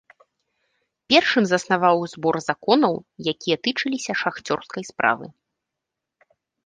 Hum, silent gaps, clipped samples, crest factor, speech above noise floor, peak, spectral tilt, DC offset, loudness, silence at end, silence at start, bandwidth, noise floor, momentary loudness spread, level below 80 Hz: none; none; under 0.1%; 22 dB; 63 dB; -2 dBFS; -4 dB/octave; under 0.1%; -21 LUFS; 1.35 s; 1.1 s; 10 kHz; -84 dBFS; 10 LU; -68 dBFS